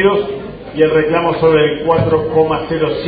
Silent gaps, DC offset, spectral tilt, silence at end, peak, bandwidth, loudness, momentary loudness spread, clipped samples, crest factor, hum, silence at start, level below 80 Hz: none; under 0.1%; -10.5 dB/octave; 0 s; 0 dBFS; 5 kHz; -14 LUFS; 8 LU; under 0.1%; 14 dB; none; 0 s; -40 dBFS